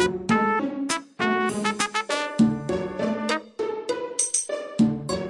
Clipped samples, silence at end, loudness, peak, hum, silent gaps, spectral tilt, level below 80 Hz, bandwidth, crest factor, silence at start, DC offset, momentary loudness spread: under 0.1%; 0 s; -25 LUFS; -8 dBFS; none; none; -3.5 dB/octave; -56 dBFS; 11.5 kHz; 18 dB; 0 s; under 0.1%; 6 LU